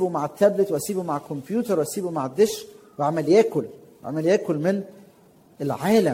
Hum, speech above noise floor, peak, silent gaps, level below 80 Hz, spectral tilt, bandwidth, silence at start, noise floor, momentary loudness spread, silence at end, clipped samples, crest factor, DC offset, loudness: none; 32 dB; -4 dBFS; none; -66 dBFS; -6 dB/octave; 16.5 kHz; 0 s; -54 dBFS; 13 LU; 0 s; under 0.1%; 18 dB; under 0.1%; -23 LUFS